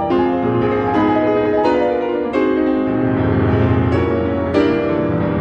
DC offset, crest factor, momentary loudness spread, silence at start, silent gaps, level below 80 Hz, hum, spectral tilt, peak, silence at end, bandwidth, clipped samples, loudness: under 0.1%; 14 dB; 3 LU; 0 s; none; -38 dBFS; none; -9 dB/octave; -2 dBFS; 0 s; 7.2 kHz; under 0.1%; -16 LUFS